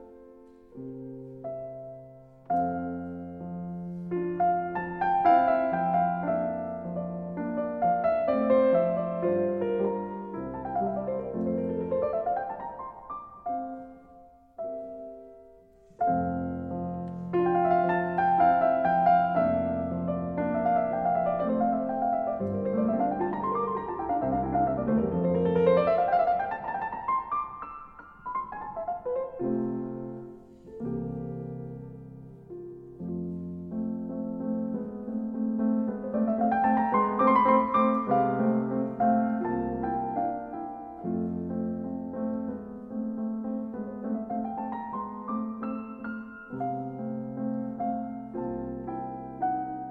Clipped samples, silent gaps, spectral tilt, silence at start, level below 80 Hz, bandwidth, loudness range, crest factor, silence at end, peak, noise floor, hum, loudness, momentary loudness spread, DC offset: under 0.1%; none; -10.5 dB/octave; 0 s; -56 dBFS; 4.6 kHz; 10 LU; 20 dB; 0 s; -10 dBFS; -55 dBFS; none; -29 LUFS; 16 LU; under 0.1%